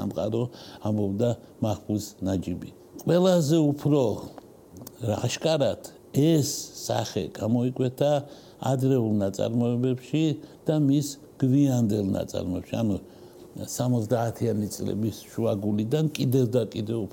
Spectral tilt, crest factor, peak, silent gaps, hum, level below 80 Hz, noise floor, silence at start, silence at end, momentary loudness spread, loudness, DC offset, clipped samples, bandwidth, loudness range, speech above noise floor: -6.5 dB/octave; 16 dB; -8 dBFS; none; none; -60 dBFS; -46 dBFS; 0 s; 0 s; 11 LU; -26 LUFS; under 0.1%; under 0.1%; 17 kHz; 3 LU; 20 dB